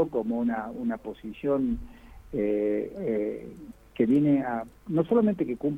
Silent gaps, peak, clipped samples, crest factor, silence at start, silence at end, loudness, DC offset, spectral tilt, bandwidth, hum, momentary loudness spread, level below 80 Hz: none; -10 dBFS; under 0.1%; 18 dB; 0 s; 0 s; -28 LUFS; under 0.1%; -9.5 dB/octave; 4 kHz; none; 13 LU; -52 dBFS